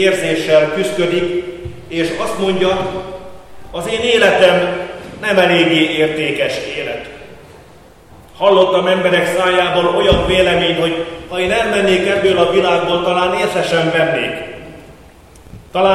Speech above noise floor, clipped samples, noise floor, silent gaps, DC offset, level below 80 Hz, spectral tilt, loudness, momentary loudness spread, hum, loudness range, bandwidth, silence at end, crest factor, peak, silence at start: 28 dB; under 0.1%; -42 dBFS; none; under 0.1%; -38 dBFS; -4.5 dB/octave; -14 LUFS; 13 LU; none; 4 LU; 14 kHz; 0 s; 14 dB; 0 dBFS; 0 s